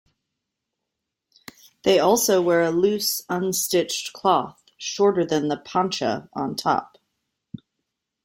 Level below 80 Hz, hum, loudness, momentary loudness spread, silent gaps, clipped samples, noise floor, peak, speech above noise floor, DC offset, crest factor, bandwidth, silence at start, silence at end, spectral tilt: -66 dBFS; none; -22 LUFS; 14 LU; none; under 0.1%; -82 dBFS; -6 dBFS; 61 dB; under 0.1%; 18 dB; 16.5 kHz; 1.85 s; 1.4 s; -3.5 dB/octave